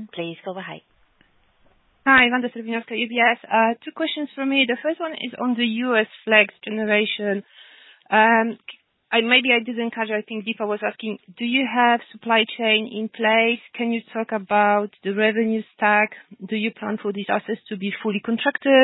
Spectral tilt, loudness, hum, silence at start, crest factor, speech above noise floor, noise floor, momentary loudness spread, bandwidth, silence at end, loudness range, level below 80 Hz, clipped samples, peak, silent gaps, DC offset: -9 dB/octave; -21 LUFS; none; 0 s; 22 dB; 39 dB; -60 dBFS; 13 LU; 4.1 kHz; 0 s; 2 LU; -68 dBFS; under 0.1%; 0 dBFS; none; under 0.1%